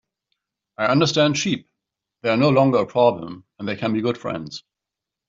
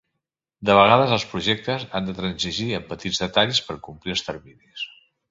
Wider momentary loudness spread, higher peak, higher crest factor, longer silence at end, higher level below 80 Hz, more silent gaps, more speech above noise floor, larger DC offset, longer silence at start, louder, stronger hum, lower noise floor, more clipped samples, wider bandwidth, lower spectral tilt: second, 15 LU vs 18 LU; about the same, -4 dBFS vs -2 dBFS; about the same, 18 dB vs 22 dB; first, 0.7 s vs 0.45 s; second, -60 dBFS vs -52 dBFS; neither; first, 66 dB vs 60 dB; neither; first, 0.8 s vs 0.6 s; about the same, -20 LUFS vs -21 LUFS; neither; first, -86 dBFS vs -82 dBFS; neither; about the same, 7.8 kHz vs 7.8 kHz; about the same, -5.5 dB/octave vs -4.5 dB/octave